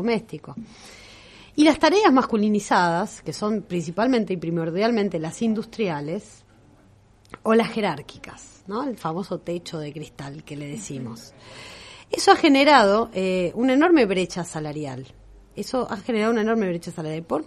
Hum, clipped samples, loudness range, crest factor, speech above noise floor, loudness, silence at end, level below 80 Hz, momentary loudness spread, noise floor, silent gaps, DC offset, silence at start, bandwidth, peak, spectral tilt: none; under 0.1%; 12 LU; 22 dB; 32 dB; -22 LUFS; 0.05 s; -56 dBFS; 22 LU; -54 dBFS; none; under 0.1%; 0 s; 13 kHz; -2 dBFS; -5 dB/octave